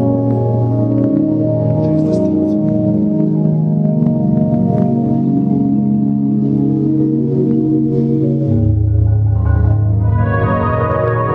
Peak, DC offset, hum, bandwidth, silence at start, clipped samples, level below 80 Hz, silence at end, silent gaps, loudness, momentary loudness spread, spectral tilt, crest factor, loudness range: -2 dBFS; under 0.1%; none; 3.5 kHz; 0 s; under 0.1%; -28 dBFS; 0 s; none; -14 LUFS; 1 LU; -11.5 dB/octave; 10 dB; 0 LU